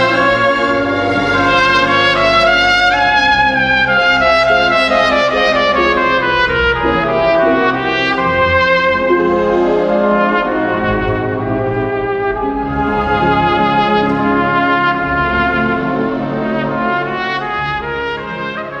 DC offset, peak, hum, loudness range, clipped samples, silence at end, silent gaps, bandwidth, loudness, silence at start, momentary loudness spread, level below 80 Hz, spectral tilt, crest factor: under 0.1%; 0 dBFS; none; 5 LU; under 0.1%; 0 s; none; 11 kHz; -13 LUFS; 0 s; 7 LU; -34 dBFS; -5.5 dB/octave; 12 dB